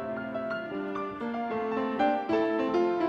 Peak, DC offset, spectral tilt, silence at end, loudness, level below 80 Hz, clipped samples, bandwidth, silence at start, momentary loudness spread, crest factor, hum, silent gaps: -14 dBFS; under 0.1%; -7 dB/octave; 0 s; -30 LUFS; -64 dBFS; under 0.1%; 7 kHz; 0 s; 7 LU; 14 dB; none; none